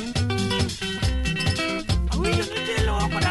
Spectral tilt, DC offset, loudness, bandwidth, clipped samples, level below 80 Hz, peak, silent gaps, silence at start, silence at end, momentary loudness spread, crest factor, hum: -4.5 dB/octave; under 0.1%; -24 LUFS; 12 kHz; under 0.1%; -30 dBFS; -10 dBFS; none; 0 s; 0 s; 2 LU; 14 dB; none